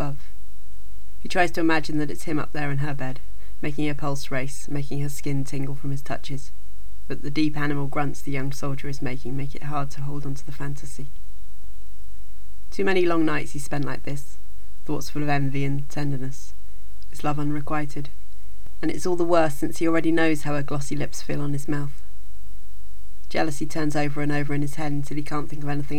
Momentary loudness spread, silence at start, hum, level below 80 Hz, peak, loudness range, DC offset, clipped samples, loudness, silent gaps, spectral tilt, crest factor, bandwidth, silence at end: 25 LU; 0 s; none; -42 dBFS; -4 dBFS; 6 LU; 20%; under 0.1%; -27 LUFS; none; -6 dB/octave; 20 dB; 19.5 kHz; 0 s